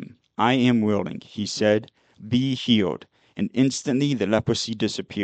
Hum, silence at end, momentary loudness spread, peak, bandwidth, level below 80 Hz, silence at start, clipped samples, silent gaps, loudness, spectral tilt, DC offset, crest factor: none; 0 s; 11 LU; -6 dBFS; 9 kHz; -58 dBFS; 0 s; under 0.1%; none; -23 LUFS; -5.5 dB/octave; under 0.1%; 18 dB